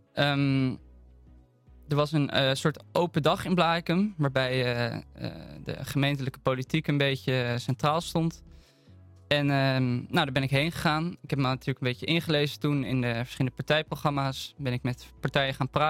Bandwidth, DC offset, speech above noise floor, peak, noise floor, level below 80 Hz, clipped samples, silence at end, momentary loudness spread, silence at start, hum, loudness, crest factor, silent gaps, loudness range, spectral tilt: 16 kHz; under 0.1%; 28 dB; -8 dBFS; -56 dBFS; -56 dBFS; under 0.1%; 0 s; 7 LU; 0.15 s; none; -28 LUFS; 20 dB; none; 2 LU; -6 dB/octave